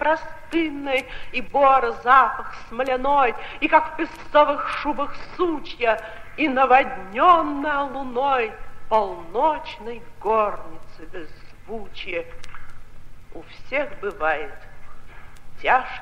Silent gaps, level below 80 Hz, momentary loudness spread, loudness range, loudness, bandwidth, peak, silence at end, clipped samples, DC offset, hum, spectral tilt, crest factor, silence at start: none; -42 dBFS; 20 LU; 11 LU; -21 LUFS; 11.5 kHz; -2 dBFS; 0 s; under 0.1%; under 0.1%; none; -5 dB/octave; 20 dB; 0 s